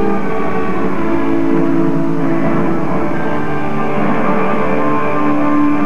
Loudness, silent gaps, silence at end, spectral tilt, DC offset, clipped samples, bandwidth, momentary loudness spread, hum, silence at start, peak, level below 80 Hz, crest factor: -16 LUFS; none; 0 s; -8.5 dB/octave; 20%; under 0.1%; 9.4 kHz; 4 LU; none; 0 s; -2 dBFS; -42 dBFS; 12 dB